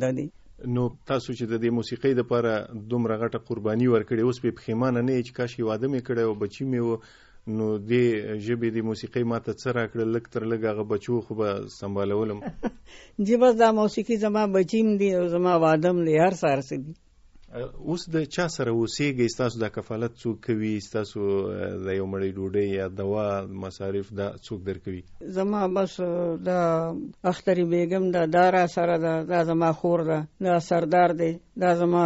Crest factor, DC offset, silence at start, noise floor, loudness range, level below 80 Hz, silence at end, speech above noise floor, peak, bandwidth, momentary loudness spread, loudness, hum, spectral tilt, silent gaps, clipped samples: 18 dB; under 0.1%; 0 s; -51 dBFS; 6 LU; -56 dBFS; 0 s; 27 dB; -8 dBFS; 8 kHz; 11 LU; -25 LUFS; none; -6 dB/octave; none; under 0.1%